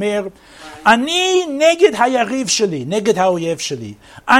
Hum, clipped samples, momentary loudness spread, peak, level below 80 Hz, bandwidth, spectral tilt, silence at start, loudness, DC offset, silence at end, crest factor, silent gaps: none; under 0.1%; 13 LU; 0 dBFS; -54 dBFS; 16 kHz; -3 dB/octave; 0 s; -15 LUFS; under 0.1%; 0 s; 16 dB; none